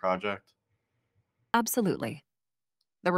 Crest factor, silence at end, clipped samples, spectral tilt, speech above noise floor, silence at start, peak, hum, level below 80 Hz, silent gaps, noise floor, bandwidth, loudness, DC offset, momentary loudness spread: 24 dB; 0 s; under 0.1%; -4.5 dB/octave; over 60 dB; 0.05 s; -8 dBFS; none; -70 dBFS; none; under -90 dBFS; 16 kHz; -31 LUFS; under 0.1%; 13 LU